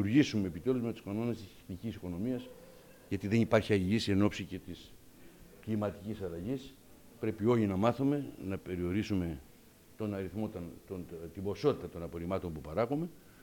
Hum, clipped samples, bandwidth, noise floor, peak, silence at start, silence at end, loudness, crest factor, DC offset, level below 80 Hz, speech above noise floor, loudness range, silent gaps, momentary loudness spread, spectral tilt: none; under 0.1%; 17.5 kHz; -59 dBFS; -14 dBFS; 0 s; 0 s; -35 LUFS; 22 dB; under 0.1%; -62 dBFS; 25 dB; 5 LU; none; 15 LU; -7 dB/octave